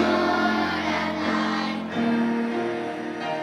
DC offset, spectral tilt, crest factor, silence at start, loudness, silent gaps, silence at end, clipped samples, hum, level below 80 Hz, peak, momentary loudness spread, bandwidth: under 0.1%; -5.5 dB/octave; 14 dB; 0 s; -25 LUFS; none; 0 s; under 0.1%; none; -64 dBFS; -10 dBFS; 7 LU; 11.5 kHz